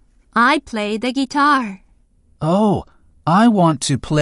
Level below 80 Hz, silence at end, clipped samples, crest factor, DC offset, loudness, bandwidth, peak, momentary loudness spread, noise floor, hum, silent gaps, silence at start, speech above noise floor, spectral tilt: -46 dBFS; 0 s; under 0.1%; 14 dB; under 0.1%; -17 LUFS; 11.5 kHz; -2 dBFS; 10 LU; -54 dBFS; none; none; 0.35 s; 38 dB; -5.5 dB/octave